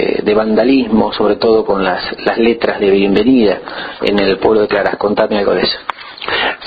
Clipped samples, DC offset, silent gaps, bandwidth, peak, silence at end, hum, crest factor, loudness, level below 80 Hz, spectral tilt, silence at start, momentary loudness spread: under 0.1%; under 0.1%; none; 5 kHz; 0 dBFS; 0 s; none; 12 dB; -13 LUFS; -42 dBFS; -8 dB/octave; 0 s; 7 LU